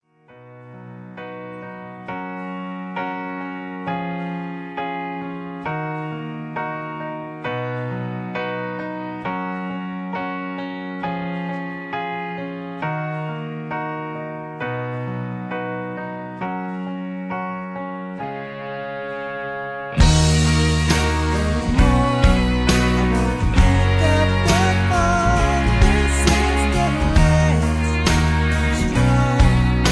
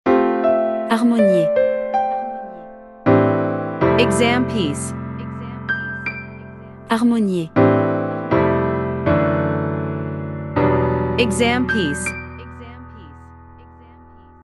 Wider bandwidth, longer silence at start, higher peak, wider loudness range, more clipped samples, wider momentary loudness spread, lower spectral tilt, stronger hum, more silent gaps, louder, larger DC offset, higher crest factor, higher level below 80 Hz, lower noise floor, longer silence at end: about the same, 11 kHz vs 12 kHz; first, 0.35 s vs 0.05 s; about the same, -2 dBFS vs -2 dBFS; first, 11 LU vs 3 LU; neither; second, 13 LU vs 19 LU; about the same, -5.5 dB/octave vs -6 dB/octave; neither; neither; about the same, -21 LUFS vs -19 LUFS; neither; about the same, 18 dB vs 18 dB; first, -26 dBFS vs -44 dBFS; about the same, -47 dBFS vs -44 dBFS; second, 0 s vs 0.9 s